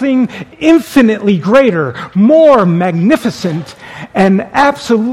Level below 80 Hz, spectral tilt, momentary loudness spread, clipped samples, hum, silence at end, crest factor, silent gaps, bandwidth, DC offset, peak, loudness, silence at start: -46 dBFS; -7 dB/octave; 12 LU; 0.5%; none; 0 s; 10 dB; none; 15.5 kHz; under 0.1%; 0 dBFS; -10 LUFS; 0 s